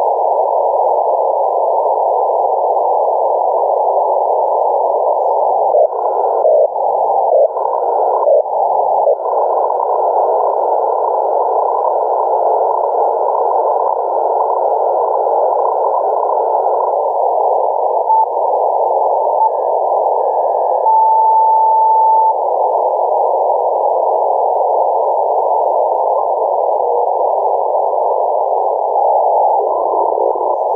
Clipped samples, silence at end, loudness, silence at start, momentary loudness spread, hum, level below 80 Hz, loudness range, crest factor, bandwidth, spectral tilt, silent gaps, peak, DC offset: under 0.1%; 0 s; -14 LUFS; 0 s; 3 LU; none; -72 dBFS; 2 LU; 10 dB; 1.8 kHz; -7.5 dB/octave; none; -4 dBFS; under 0.1%